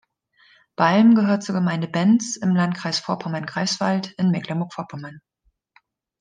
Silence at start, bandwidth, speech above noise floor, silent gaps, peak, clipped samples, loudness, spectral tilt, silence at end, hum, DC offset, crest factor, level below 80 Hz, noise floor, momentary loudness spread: 0.8 s; 9.6 kHz; 41 dB; none; -4 dBFS; under 0.1%; -21 LUFS; -5.5 dB/octave; 1.05 s; none; under 0.1%; 18 dB; -70 dBFS; -61 dBFS; 16 LU